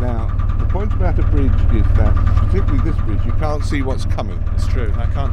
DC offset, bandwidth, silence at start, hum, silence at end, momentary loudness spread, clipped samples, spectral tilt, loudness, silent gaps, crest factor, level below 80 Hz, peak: under 0.1%; 8.6 kHz; 0 s; none; 0 s; 5 LU; under 0.1%; -8 dB/octave; -19 LUFS; none; 12 dB; -16 dBFS; -2 dBFS